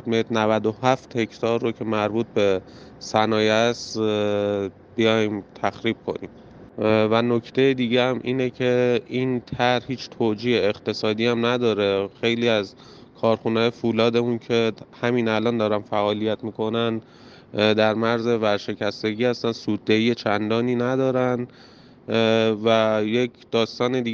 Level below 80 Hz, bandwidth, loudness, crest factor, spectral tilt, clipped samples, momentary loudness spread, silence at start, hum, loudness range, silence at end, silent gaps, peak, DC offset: -62 dBFS; 7.4 kHz; -22 LUFS; 18 dB; -6 dB/octave; under 0.1%; 7 LU; 0.05 s; none; 2 LU; 0 s; none; -4 dBFS; under 0.1%